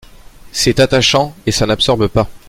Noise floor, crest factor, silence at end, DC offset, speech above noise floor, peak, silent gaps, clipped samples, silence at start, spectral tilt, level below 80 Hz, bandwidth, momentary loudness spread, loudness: -37 dBFS; 14 dB; 0.1 s; under 0.1%; 24 dB; 0 dBFS; none; under 0.1%; 0.45 s; -4 dB/octave; -32 dBFS; 16.5 kHz; 6 LU; -13 LUFS